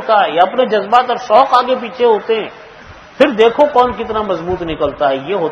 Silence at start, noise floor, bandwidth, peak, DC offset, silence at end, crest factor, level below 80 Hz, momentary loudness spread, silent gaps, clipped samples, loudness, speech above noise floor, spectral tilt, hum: 0 s; -37 dBFS; 8.2 kHz; 0 dBFS; under 0.1%; 0 s; 14 dB; -44 dBFS; 9 LU; none; 0.2%; -13 LUFS; 24 dB; -5.5 dB/octave; none